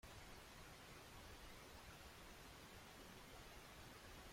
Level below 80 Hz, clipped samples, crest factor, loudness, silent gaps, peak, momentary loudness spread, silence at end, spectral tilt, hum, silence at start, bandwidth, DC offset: -68 dBFS; under 0.1%; 14 dB; -60 LUFS; none; -46 dBFS; 0 LU; 0 s; -3.5 dB/octave; none; 0.05 s; 16.5 kHz; under 0.1%